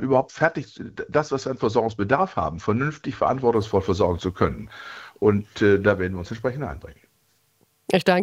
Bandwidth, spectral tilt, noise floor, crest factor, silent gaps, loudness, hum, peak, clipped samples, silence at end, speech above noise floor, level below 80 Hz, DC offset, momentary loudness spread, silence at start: 15 kHz; -6.5 dB/octave; -65 dBFS; 20 dB; none; -23 LUFS; none; -2 dBFS; under 0.1%; 0 s; 43 dB; -50 dBFS; under 0.1%; 15 LU; 0 s